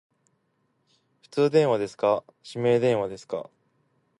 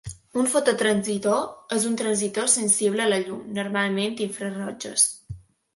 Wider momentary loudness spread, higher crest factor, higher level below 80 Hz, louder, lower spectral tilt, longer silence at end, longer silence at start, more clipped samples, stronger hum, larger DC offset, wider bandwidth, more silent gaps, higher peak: first, 14 LU vs 11 LU; about the same, 18 dB vs 18 dB; second, -68 dBFS vs -58 dBFS; about the same, -25 LUFS vs -23 LUFS; first, -6.5 dB/octave vs -3 dB/octave; first, 0.75 s vs 0.35 s; first, 1.35 s vs 0.05 s; neither; neither; neither; about the same, 11 kHz vs 12 kHz; neither; about the same, -8 dBFS vs -6 dBFS